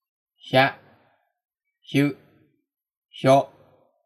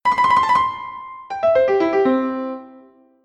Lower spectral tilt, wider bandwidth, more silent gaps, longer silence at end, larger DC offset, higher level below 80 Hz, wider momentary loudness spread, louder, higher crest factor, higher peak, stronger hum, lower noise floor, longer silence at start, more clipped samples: about the same, -6 dB/octave vs -5.5 dB/octave; first, 13.5 kHz vs 11 kHz; first, 2.97-3.02 s vs none; first, 0.6 s vs 0.45 s; neither; second, -80 dBFS vs -54 dBFS; second, 12 LU vs 16 LU; second, -22 LUFS vs -17 LUFS; first, 22 dB vs 14 dB; about the same, -4 dBFS vs -6 dBFS; neither; first, -64 dBFS vs -48 dBFS; first, 0.45 s vs 0.05 s; neither